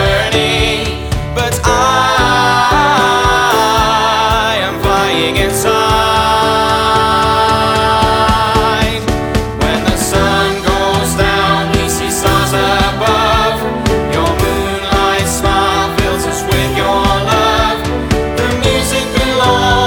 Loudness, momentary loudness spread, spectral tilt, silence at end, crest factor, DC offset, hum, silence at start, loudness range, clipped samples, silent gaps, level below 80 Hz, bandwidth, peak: -12 LUFS; 5 LU; -4 dB/octave; 0 s; 12 dB; under 0.1%; none; 0 s; 2 LU; under 0.1%; none; -24 dBFS; over 20 kHz; 0 dBFS